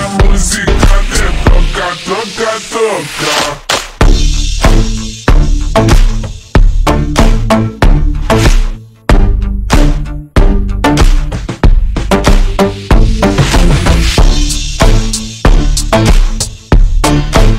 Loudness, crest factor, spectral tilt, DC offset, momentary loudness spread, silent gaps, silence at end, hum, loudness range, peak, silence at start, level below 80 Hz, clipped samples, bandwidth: -11 LUFS; 8 dB; -5 dB/octave; under 0.1%; 6 LU; none; 0 s; none; 2 LU; 0 dBFS; 0 s; -10 dBFS; 0.4%; 13.5 kHz